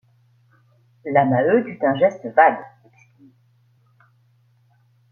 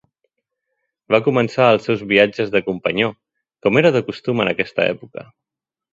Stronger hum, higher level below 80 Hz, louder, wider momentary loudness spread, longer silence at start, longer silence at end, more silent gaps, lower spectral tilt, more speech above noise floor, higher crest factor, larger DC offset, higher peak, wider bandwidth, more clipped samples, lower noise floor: neither; second, -70 dBFS vs -58 dBFS; about the same, -18 LUFS vs -17 LUFS; about the same, 8 LU vs 8 LU; about the same, 1.05 s vs 1.1 s; first, 2.45 s vs 0.7 s; neither; first, -8.5 dB/octave vs -6.5 dB/octave; second, 42 dB vs 70 dB; about the same, 22 dB vs 18 dB; neither; about the same, -2 dBFS vs 0 dBFS; second, 6.8 kHz vs 7.8 kHz; neither; second, -59 dBFS vs -87 dBFS